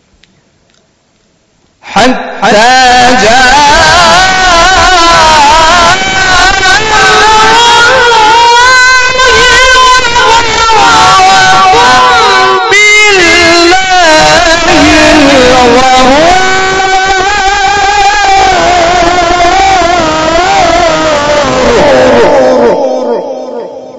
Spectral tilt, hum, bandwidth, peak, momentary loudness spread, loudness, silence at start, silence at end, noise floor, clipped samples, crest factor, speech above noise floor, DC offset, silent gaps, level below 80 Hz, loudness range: -2 dB/octave; none; 11 kHz; 0 dBFS; 5 LU; -3 LUFS; 1.85 s; 0 s; -50 dBFS; 8%; 4 dB; 47 dB; under 0.1%; none; -24 dBFS; 3 LU